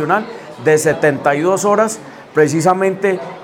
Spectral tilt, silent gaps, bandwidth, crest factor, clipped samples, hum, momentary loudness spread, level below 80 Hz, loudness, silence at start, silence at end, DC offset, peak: -5 dB/octave; none; 17 kHz; 14 dB; under 0.1%; none; 7 LU; -58 dBFS; -15 LUFS; 0 s; 0 s; under 0.1%; 0 dBFS